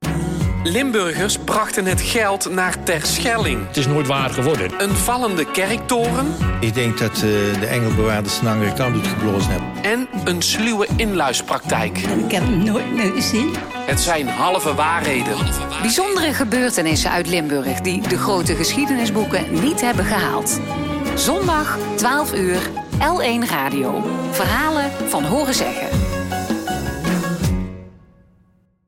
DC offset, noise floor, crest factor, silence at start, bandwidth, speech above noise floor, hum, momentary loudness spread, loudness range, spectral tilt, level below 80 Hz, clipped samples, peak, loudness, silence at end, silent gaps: under 0.1%; -57 dBFS; 12 dB; 0 s; 16.5 kHz; 38 dB; none; 4 LU; 1 LU; -4 dB/octave; -34 dBFS; under 0.1%; -6 dBFS; -19 LUFS; 0.9 s; none